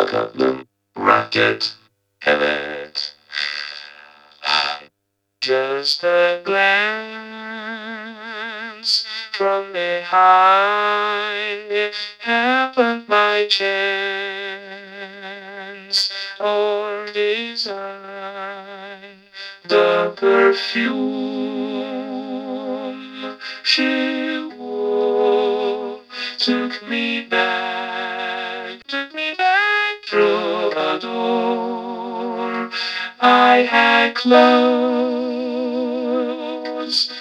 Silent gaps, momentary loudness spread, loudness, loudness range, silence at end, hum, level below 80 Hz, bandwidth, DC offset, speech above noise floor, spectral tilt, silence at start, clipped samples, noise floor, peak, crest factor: none; 17 LU; -18 LUFS; 7 LU; 0 s; none; -72 dBFS; 11.5 kHz; under 0.1%; 56 dB; -3.5 dB/octave; 0 s; under 0.1%; -73 dBFS; 0 dBFS; 20 dB